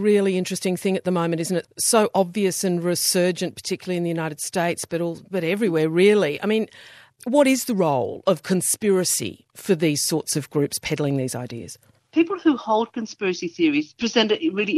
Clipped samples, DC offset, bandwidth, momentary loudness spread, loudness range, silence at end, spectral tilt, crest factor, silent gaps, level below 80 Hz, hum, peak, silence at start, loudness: under 0.1%; under 0.1%; 14.5 kHz; 8 LU; 3 LU; 0 s; -4 dB/octave; 18 dB; none; -66 dBFS; none; -4 dBFS; 0 s; -22 LUFS